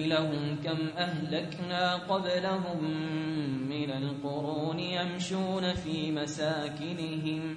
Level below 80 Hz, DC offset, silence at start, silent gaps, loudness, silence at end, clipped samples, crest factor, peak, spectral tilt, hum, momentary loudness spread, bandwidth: -60 dBFS; under 0.1%; 0 s; none; -32 LUFS; 0 s; under 0.1%; 18 dB; -14 dBFS; -5.5 dB/octave; none; 5 LU; 10.5 kHz